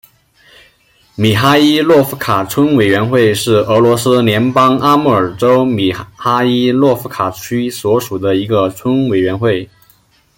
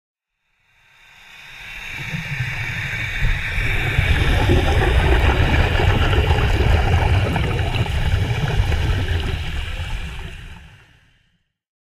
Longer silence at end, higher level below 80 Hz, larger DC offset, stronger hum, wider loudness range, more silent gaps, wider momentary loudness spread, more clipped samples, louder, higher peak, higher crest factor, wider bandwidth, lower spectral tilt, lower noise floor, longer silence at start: second, 0.7 s vs 1.15 s; second, -48 dBFS vs -22 dBFS; neither; neither; second, 4 LU vs 8 LU; neither; second, 7 LU vs 14 LU; neither; first, -12 LUFS vs -20 LUFS; about the same, 0 dBFS vs -2 dBFS; about the same, 12 dB vs 16 dB; first, 17 kHz vs 15 kHz; about the same, -6 dB/octave vs -6 dB/octave; second, -51 dBFS vs -68 dBFS; second, 1.2 s vs 1.35 s